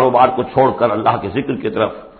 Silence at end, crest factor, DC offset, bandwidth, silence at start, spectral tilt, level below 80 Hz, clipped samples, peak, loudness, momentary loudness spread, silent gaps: 0.1 s; 14 dB; under 0.1%; 4.6 kHz; 0 s; -12 dB/octave; -46 dBFS; under 0.1%; 0 dBFS; -16 LUFS; 7 LU; none